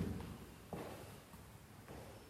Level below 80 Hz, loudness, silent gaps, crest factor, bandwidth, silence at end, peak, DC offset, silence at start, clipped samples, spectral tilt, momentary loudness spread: -62 dBFS; -52 LUFS; none; 22 dB; 16 kHz; 0 s; -28 dBFS; under 0.1%; 0 s; under 0.1%; -6 dB/octave; 9 LU